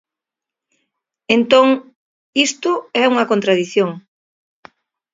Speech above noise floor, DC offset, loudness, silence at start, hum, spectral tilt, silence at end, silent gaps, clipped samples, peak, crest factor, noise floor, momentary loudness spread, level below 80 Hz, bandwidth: 71 dB; under 0.1%; -16 LUFS; 1.3 s; none; -3.5 dB/octave; 1.15 s; 1.95-2.33 s; under 0.1%; 0 dBFS; 18 dB; -86 dBFS; 10 LU; -66 dBFS; 7.8 kHz